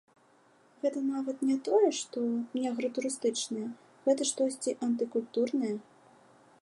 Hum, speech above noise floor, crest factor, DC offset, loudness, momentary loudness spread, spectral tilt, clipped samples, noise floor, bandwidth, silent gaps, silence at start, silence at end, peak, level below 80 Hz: none; 33 dB; 18 dB; under 0.1%; -31 LUFS; 8 LU; -3.5 dB/octave; under 0.1%; -64 dBFS; 11.5 kHz; none; 0.85 s; 0.8 s; -14 dBFS; -86 dBFS